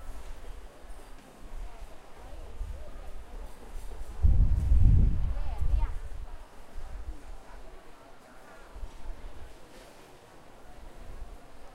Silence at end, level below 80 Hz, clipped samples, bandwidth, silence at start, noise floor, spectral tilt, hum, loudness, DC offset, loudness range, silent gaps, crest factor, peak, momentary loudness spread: 0 s; -32 dBFS; under 0.1%; 11 kHz; 0 s; -51 dBFS; -7.5 dB/octave; none; -31 LUFS; under 0.1%; 20 LU; none; 22 dB; -8 dBFS; 25 LU